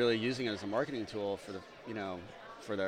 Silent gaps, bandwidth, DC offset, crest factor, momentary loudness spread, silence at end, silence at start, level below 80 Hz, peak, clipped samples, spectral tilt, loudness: none; 13.5 kHz; under 0.1%; 18 dB; 13 LU; 0 s; 0 s; -68 dBFS; -18 dBFS; under 0.1%; -5.5 dB/octave; -37 LUFS